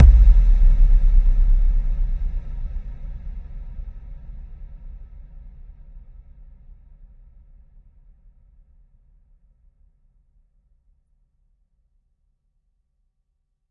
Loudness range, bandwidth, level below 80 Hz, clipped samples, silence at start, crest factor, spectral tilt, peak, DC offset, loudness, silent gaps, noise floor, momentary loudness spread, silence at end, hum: 27 LU; 1.8 kHz; -20 dBFS; under 0.1%; 0 s; 20 dB; -9.5 dB/octave; 0 dBFS; under 0.1%; -21 LUFS; none; -71 dBFS; 26 LU; 7.7 s; none